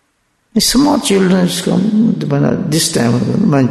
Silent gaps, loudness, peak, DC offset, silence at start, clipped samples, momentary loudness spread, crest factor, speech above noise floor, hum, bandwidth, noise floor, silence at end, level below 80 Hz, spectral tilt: none; -13 LUFS; -2 dBFS; under 0.1%; 0.55 s; under 0.1%; 3 LU; 12 dB; 49 dB; none; 12.5 kHz; -61 dBFS; 0 s; -40 dBFS; -5 dB/octave